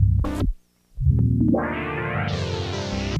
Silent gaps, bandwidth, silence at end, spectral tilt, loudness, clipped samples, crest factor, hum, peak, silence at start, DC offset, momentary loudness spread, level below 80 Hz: none; 9.4 kHz; 0 s; -7 dB/octave; -24 LUFS; under 0.1%; 16 dB; none; -8 dBFS; 0 s; under 0.1%; 8 LU; -30 dBFS